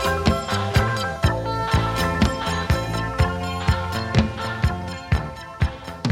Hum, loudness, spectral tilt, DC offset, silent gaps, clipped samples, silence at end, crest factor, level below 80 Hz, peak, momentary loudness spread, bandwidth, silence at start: none; -23 LUFS; -5.5 dB/octave; under 0.1%; none; under 0.1%; 0 s; 18 dB; -32 dBFS; -4 dBFS; 6 LU; 16.5 kHz; 0 s